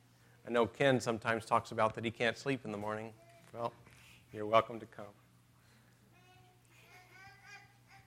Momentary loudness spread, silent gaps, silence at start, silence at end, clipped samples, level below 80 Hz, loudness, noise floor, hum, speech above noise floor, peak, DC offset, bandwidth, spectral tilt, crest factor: 24 LU; none; 0.45 s; 0.1 s; under 0.1%; -74 dBFS; -35 LUFS; -66 dBFS; none; 31 dB; -12 dBFS; under 0.1%; 16 kHz; -5 dB/octave; 26 dB